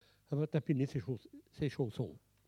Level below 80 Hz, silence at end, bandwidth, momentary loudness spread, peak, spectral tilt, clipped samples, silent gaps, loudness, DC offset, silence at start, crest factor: -66 dBFS; 0.3 s; 11 kHz; 10 LU; -20 dBFS; -8.5 dB/octave; under 0.1%; none; -38 LUFS; under 0.1%; 0.3 s; 18 dB